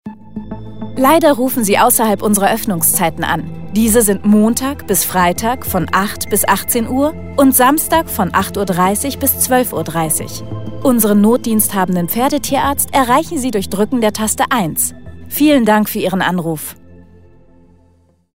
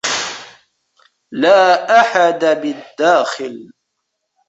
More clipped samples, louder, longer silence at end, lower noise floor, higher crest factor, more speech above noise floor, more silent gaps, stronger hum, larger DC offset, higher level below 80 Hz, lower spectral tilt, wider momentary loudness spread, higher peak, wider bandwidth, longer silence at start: neither; about the same, -14 LUFS vs -14 LUFS; second, 0 s vs 0.85 s; second, -53 dBFS vs -73 dBFS; about the same, 14 dB vs 14 dB; second, 39 dB vs 60 dB; neither; neither; first, 2% vs under 0.1%; first, -40 dBFS vs -66 dBFS; first, -4 dB/octave vs -2.5 dB/octave; second, 8 LU vs 18 LU; about the same, 0 dBFS vs 0 dBFS; first, 16.5 kHz vs 8.2 kHz; about the same, 0 s vs 0.05 s